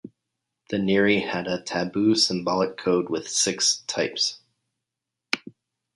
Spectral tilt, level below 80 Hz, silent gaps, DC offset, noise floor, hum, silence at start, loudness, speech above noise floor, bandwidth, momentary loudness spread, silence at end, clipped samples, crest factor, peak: -3 dB/octave; -62 dBFS; none; under 0.1%; -86 dBFS; none; 0.05 s; -23 LUFS; 62 dB; 11.5 kHz; 9 LU; 0.45 s; under 0.1%; 22 dB; -2 dBFS